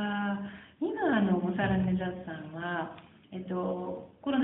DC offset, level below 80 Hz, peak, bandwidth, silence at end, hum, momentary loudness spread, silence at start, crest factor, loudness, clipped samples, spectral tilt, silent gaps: under 0.1%; -60 dBFS; -14 dBFS; 3.9 kHz; 0 s; none; 14 LU; 0 s; 18 dB; -32 LUFS; under 0.1%; -6 dB/octave; none